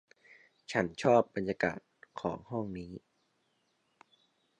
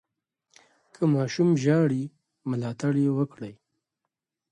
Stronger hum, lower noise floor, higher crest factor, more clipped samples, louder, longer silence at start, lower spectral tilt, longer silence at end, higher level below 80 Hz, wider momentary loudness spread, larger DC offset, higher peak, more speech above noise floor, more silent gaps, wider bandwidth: neither; second, -76 dBFS vs -85 dBFS; about the same, 22 dB vs 18 dB; neither; second, -33 LUFS vs -25 LUFS; second, 0.7 s vs 1 s; second, -6 dB/octave vs -7.5 dB/octave; first, 1.6 s vs 1 s; about the same, -66 dBFS vs -70 dBFS; first, 22 LU vs 17 LU; neither; about the same, -12 dBFS vs -10 dBFS; second, 44 dB vs 61 dB; neither; about the same, 10 kHz vs 9.8 kHz